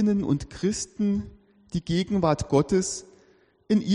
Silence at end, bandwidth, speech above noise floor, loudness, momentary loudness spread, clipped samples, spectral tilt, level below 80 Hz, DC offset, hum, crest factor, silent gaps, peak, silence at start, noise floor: 0 s; 11 kHz; 35 dB; -26 LUFS; 11 LU; under 0.1%; -6 dB/octave; -48 dBFS; under 0.1%; none; 18 dB; none; -8 dBFS; 0 s; -60 dBFS